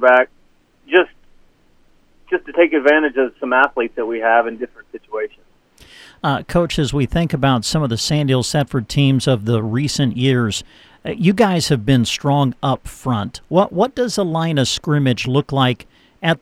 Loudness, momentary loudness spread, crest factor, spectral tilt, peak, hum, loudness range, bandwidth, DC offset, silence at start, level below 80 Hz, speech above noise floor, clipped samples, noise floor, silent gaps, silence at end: -17 LUFS; 9 LU; 18 dB; -5.5 dB/octave; 0 dBFS; none; 3 LU; 15 kHz; under 0.1%; 0 s; -42 dBFS; 37 dB; under 0.1%; -54 dBFS; none; 0.05 s